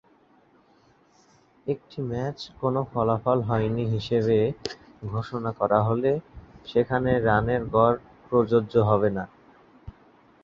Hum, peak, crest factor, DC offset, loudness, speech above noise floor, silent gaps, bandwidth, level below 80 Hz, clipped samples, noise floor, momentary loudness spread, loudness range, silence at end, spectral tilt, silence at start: none; -6 dBFS; 20 dB; under 0.1%; -25 LUFS; 36 dB; none; 7.2 kHz; -50 dBFS; under 0.1%; -60 dBFS; 11 LU; 5 LU; 0.55 s; -8 dB/octave; 1.65 s